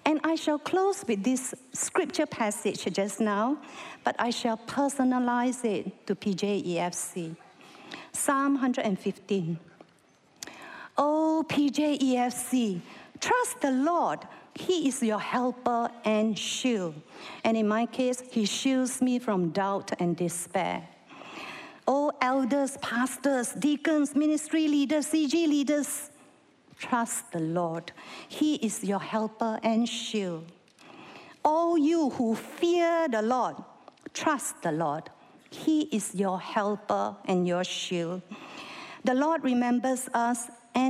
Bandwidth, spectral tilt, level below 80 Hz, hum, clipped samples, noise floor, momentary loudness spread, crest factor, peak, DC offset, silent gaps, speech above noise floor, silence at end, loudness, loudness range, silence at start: 15 kHz; -4.5 dB/octave; -76 dBFS; none; under 0.1%; -62 dBFS; 13 LU; 20 dB; -10 dBFS; under 0.1%; none; 34 dB; 0 s; -28 LUFS; 4 LU; 0.05 s